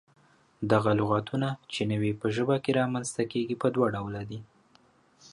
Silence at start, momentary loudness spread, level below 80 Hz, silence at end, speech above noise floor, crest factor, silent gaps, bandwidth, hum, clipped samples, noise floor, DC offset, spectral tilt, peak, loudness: 0.6 s; 11 LU; -60 dBFS; 0.05 s; 35 dB; 18 dB; none; 11.5 kHz; none; under 0.1%; -63 dBFS; under 0.1%; -6 dB/octave; -10 dBFS; -28 LUFS